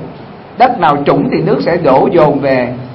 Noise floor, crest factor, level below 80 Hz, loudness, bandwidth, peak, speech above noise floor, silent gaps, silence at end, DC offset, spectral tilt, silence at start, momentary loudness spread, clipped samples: -30 dBFS; 10 dB; -44 dBFS; -10 LUFS; 5.8 kHz; 0 dBFS; 20 dB; none; 0 s; under 0.1%; -9 dB/octave; 0 s; 13 LU; 0.2%